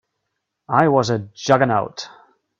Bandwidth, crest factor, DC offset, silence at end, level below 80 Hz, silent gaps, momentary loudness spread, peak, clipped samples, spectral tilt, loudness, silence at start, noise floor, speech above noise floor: 8.2 kHz; 20 dB; under 0.1%; 0.5 s; -58 dBFS; none; 15 LU; 0 dBFS; under 0.1%; -5.5 dB/octave; -18 LUFS; 0.7 s; -77 dBFS; 59 dB